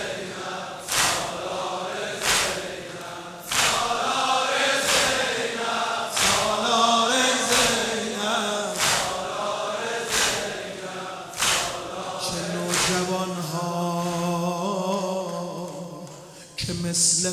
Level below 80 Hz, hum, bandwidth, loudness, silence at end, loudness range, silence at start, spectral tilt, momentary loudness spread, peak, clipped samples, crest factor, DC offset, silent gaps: -54 dBFS; none; 16 kHz; -23 LUFS; 0 s; 5 LU; 0 s; -2 dB/octave; 14 LU; -6 dBFS; under 0.1%; 20 dB; under 0.1%; none